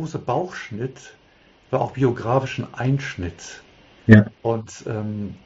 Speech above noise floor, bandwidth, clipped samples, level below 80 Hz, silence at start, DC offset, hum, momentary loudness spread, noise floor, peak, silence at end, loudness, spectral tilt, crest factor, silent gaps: 33 dB; 7.8 kHz; under 0.1%; -48 dBFS; 0 s; under 0.1%; none; 18 LU; -54 dBFS; 0 dBFS; 0.1 s; -22 LUFS; -7 dB/octave; 22 dB; none